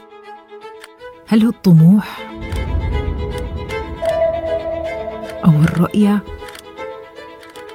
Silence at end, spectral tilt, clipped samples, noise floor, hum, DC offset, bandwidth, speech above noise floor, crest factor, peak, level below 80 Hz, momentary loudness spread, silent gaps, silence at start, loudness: 0 s; -8.5 dB/octave; under 0.1%; -38 dBFS; none; under 0.1%; 14.5 kHz; 26 dB; 16 dB; 0 dBFS; -30 dBFS; 24 LU; none; 0.1 s; -16 LUFS